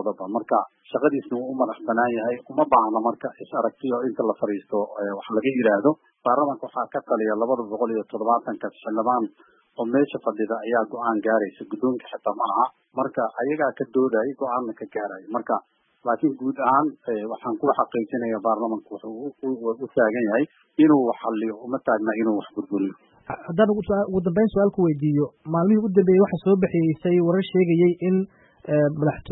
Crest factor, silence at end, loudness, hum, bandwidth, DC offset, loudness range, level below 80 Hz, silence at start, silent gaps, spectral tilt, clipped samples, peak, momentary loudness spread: 18 dB; 0 s; -23 LUFS; none; 4 kHz; under 0.1%; 5 LU; -60 dBFS; 0 s; none; -12 dB/octave; under 0.1%; -4 dBFS; 10 LU